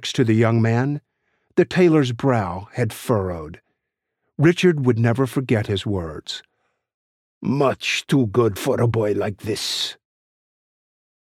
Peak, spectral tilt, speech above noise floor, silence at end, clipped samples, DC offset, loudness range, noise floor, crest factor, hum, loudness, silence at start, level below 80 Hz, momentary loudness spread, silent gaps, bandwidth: -4 dBFS; -6 dB/octave; 60 dB; 1.25 s; under 0.1%; under 0.1%; 3 LU; -80 dBFS; 18 dB; none; -20 LUFS; 0 s; -54 dBFS; 13 LU; 6.94-7.41 s; 15 kHz